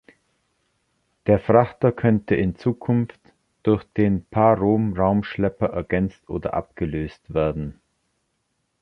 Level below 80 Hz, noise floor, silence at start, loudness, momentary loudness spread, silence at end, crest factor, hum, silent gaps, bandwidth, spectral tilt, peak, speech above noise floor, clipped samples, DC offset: -44 dBFS; -73 dBFS; 1.25 s; -22 LUFS; 11 LU; 1.1 s; 20 dB; none; none; 5.8 kHz; -10 dB/octave; -2 dBFS; 52 dB; under 0.1%; under 0.1%